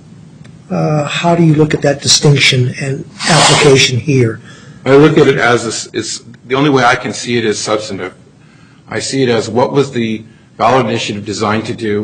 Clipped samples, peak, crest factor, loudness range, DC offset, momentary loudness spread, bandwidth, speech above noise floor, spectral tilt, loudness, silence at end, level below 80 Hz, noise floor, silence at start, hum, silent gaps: under 0.1%; 0 dBFS; 12 dB; 6 LU; under 0.1%; 13 LU; 11.5 kHz; 30 dB; -4.5 dB/octave; -11 LUFS; 0 s; -46 dBFS; -42 dBFS; 0.2 s; none; none